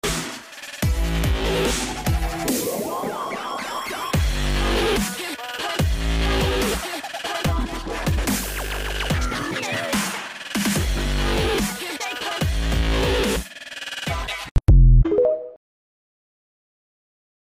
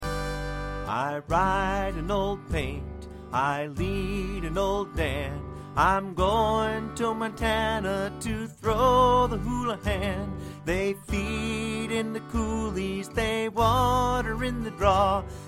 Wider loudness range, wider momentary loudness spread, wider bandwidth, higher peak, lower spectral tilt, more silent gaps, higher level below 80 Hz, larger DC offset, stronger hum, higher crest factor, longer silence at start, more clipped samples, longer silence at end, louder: about the same, 3 LU vs 4 LU; about the same, 8 LU vs 10 LU; about the same, 16 kHz vs 16 kHz; about the same, -6 dBFS vs -8 dBFS; about the same, -4.5 dB/octave vs -5.5 dB/octave; first, 14.51-14.55 s vs none; first, -26 dBFS vs -38 dBFS; neither; neither; about the same, 16 dB vs 18 dB; about the same, 0.05 s vs 0 s; neither; first, 2 s vs 0 s; first, -23 LUFS vs -27 LUFS